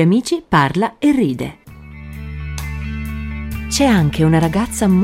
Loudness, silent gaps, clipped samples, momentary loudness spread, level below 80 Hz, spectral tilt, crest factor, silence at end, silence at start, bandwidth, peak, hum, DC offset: -17 LUFS; none; under 0.1%; 16 LU; -30 dBFS; -6 dB/octave; 16 dB; 0 s; 0 s; 16 kHz; 0 dBFS; none; under 0.1%